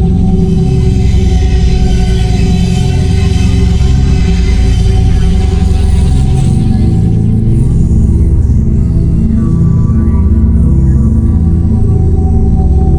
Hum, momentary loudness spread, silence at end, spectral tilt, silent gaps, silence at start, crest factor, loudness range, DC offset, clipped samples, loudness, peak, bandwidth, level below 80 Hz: none; 2 LU; 0 s; -8 dB/octave; none; 0 s; 8 dB; 1 LU; under 0.1%; under 0.1%; -10 LUFS; 0 dBFS; 10.5 kHz; -10 dBFS